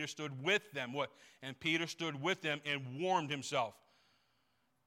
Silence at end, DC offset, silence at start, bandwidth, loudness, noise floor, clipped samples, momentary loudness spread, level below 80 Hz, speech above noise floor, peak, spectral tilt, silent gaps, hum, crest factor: 1.15 s; under 0.1%; 0 s; 16.5 kHz; -37 LUFS; -79 dBFS; under 0.1%; 8 LU; -82 dBFS; 41 dB; -20 dBFS; -4 dB/octave; none; none; 20 dB